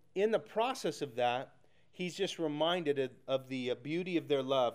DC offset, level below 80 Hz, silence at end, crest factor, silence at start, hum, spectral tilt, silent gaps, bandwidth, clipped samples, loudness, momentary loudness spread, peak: under 0.1%; -82 dBFS; 0 s; 16 dB; 0.15 s; none; -5 dB/octave; none; 15.5 kHz; under 0.1%; -35 LUFS; 6 LU; -20 dBFS